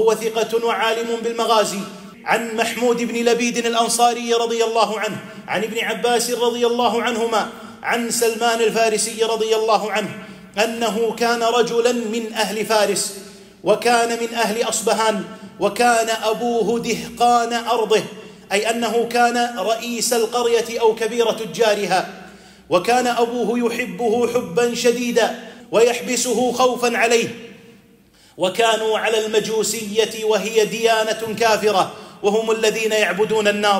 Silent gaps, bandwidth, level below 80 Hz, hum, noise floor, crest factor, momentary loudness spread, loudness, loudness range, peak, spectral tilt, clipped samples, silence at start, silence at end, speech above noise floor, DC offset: none; 16 kHz; -62 dBFS; none; -51 dBFS; 16 dB; 6 LU; -19 LUFS; 1 LU; -4 dBFS; -2.5 dB/octave; under 0.1%; 0 s; 0 s; 32 dB; under 0.1%